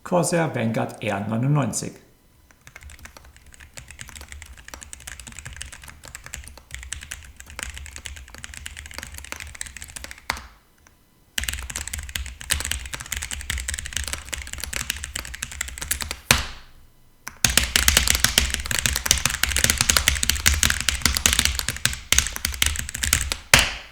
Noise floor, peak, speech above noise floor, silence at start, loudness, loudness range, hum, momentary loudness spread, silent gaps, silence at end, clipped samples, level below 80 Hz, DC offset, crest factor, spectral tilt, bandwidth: -57 dBFS; 0 dBFS; 34 dB; 0.05 s; -22 LUFS; 19 LU; none; 21 LU; none; 0 s; under 0.1%; -36 dBFS; under 0.1%; 26 dB; -2 dB/octave; over 20 kHz